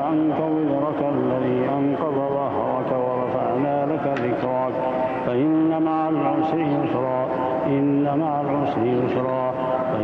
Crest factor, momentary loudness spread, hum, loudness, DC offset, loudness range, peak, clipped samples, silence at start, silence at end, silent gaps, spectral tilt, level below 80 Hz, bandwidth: 14 dB; 3 LU; none; -22 LUFS; under 0.1%; 1 LU; -8 dBFS; under 0.1%; 0 s; 0 s; none; -9.5 dB/octave; -58 dBFS; 5.6 kHz